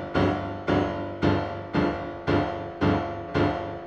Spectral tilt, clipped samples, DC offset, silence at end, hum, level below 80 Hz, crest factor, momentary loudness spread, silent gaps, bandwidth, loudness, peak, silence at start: -8 dB/octave; under 0.1%; under 0.1%; 0 s; none; -44 dBFS; 16 dB; 4 LU; none; 7.6 kHz; -27 LUFS; -10 dBFS; 0 s